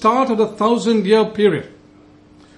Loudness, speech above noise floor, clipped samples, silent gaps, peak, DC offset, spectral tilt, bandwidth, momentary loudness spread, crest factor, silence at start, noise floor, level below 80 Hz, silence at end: -16 LUFS; 31 dB; under 0.1%; none; -2 dBFS; under 0.1%; -6 dB/octave; 10.5 kHz; 3 LU; 16 dB; 0 s; -47 dBFS; -58 dBFS; 0.9 s